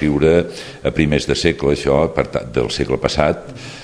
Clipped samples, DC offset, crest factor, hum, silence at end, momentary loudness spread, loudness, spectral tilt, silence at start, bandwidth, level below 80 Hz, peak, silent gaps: under 0.1%; under 0.1%; 18 dB; none; 0 s; 8 LU; -17 LUFS; -5.5 dB/octave; 0 s; 11 kHz; -34 dBFS; 0 dBFS; none